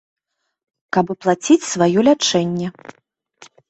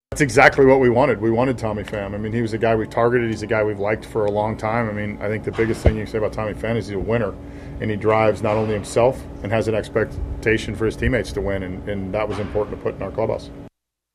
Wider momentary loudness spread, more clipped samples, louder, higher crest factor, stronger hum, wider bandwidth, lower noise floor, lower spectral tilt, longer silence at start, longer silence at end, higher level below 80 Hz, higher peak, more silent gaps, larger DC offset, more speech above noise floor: about the same, 9 LU vs 10 LU; neither; first, -17 LUFS vs -21 LUFS; about the same, 18 dB vs 20 dB; neither; second, 8.2 kHz vs 14.5 kHz; about the same, -49 dBFS vs -48 dBFS; second, -4.5 dB/octave vs -6.5 dB/octave; first, 0.95 s vs 0.1 s; first, 1 s vs 0.45 s; second, -60 dBFS vs -36 dBFS; about the same, -2 dBFS vs 0 dBFS; neither; neither; first, 32 dB vs 28 dB